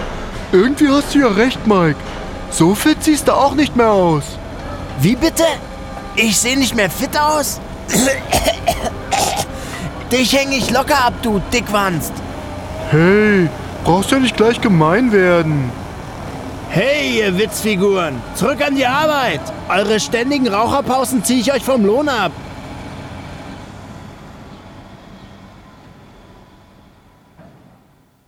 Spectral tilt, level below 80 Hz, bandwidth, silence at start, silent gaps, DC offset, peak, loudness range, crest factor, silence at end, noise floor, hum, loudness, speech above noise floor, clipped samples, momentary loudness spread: -4.5 dB/octave; -36 dBFS; 18.5 kHz; 0 s; none; under 0.1%; -2 dBFS; 4 LU; 14 dB; 0.85 s; -52 dBFS; none; -15 LUFS; 38 dB; under 0.1%; 16 LU